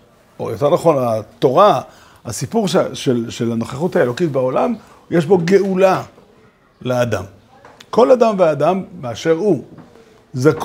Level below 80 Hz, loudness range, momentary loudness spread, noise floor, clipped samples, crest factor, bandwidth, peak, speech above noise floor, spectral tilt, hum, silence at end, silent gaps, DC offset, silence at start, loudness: -56 dBFS; 2 LU; 15 LU; -50 dBFS; under 0.1%; 16 dB; 16 kHz; 0 dBFS; 35 dB; -6 dB/octave; none; 0 s; none; under 0.1%; 0.4 s; -16 LUFS